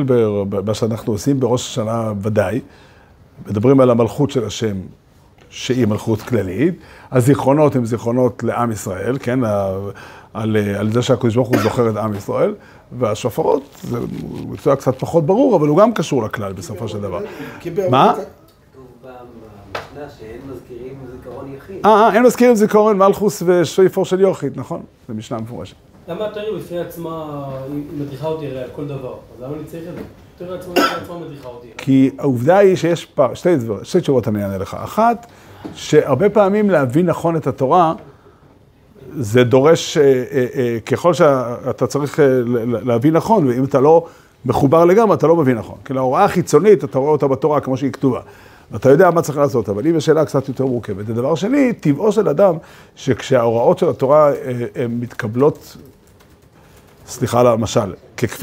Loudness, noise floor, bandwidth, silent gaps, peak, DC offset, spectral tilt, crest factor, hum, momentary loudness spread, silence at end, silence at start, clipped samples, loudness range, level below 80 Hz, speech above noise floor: -16 LUFS; -48 dBFS; 16 kHz; none; 0 dBFS; under 0.1%; -6.5 dB/octave; 16 dB; none; 18 LU; 0 s; 0 s; under 0.1%; 9 LU; -50 dBFS; 32 dB